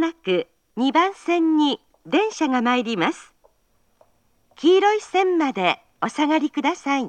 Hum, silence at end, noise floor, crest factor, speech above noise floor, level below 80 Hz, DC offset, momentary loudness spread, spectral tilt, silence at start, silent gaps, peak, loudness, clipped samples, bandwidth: none; 0 s; -65 dBFS; 18 dB; 45 dB; -70 dBFS; under 0.1%; 7 LU; -4.5 dB/octave; 0 s; none; -4 dBFS; -21 LUFS; under 0.1%; 9.2 kHz